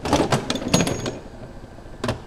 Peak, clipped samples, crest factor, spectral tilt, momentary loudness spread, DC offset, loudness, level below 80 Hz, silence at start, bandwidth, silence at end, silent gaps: 0 dBFS; under 0.1%; 24 dB; -4.5 dB/octave; 20 LU; under 0.1%; -23 LUFS; -40 dBFS; 0 s; 16.5 kHz; 0 s; none